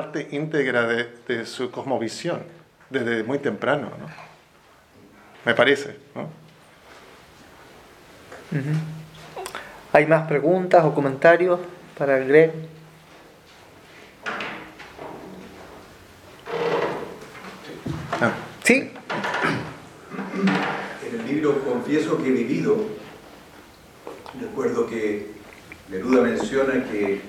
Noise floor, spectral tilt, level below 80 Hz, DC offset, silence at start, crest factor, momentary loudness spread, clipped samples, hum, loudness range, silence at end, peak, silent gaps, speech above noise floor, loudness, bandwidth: -54 dBFS; -5.5 dB/octave; -60 dBFS; under 0.1%; 0 s; 24 dB; 22 LU; under 0.1%; none; 13 LU; 0 s; 0 dBFS; none; 32 dB; -23 LUFS; 15.5 kHz